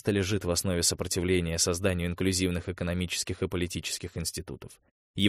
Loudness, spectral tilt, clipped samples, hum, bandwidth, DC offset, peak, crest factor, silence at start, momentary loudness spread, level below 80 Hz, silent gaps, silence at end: -29 LUFS; -4 dB/octave; under 0.1%; none; 15.5 kHz; under 0.1%; -8 dBFS; 20 dB; 0.05 s; 8 LU; -48 dBFS; 4.91-5.14 s; 0 s